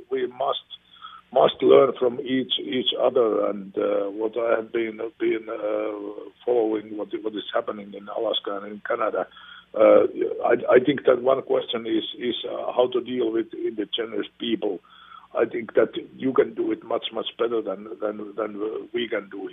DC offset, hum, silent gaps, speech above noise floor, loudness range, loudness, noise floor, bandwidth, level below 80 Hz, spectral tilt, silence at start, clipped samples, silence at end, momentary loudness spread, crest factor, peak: under 0.1%; none; none; 22 dB; 6 LU; -24 LUFS; -46 dBFS; 3.9 kHz; -70 dBFS; -8.5 dB/octave; 0 s; under 0.1%; 0 s; 13 LU; 22 dB; -2 dBFS